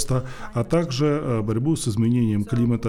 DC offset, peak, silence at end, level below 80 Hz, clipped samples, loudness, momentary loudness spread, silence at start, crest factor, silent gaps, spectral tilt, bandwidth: under 0.1%; -8 dBFS; 0 s; -44 dBFS; under 0.1%; -23 LUFS; 5 LU; 0 s; 14 dB; none; -6.5 dB/octave; 14 kHz